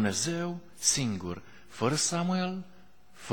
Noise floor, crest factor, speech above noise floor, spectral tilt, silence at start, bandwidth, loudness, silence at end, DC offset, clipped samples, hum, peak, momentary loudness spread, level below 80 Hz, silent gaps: -57 dBFS; 22 dB; 27 dB; -3.5 dB/octave; 0 s; 19 kHz; -30 LUFS; 0 s; 0.3%; under 0.1%; none; -10 dBFS; 16 LU; -60 dBFS; none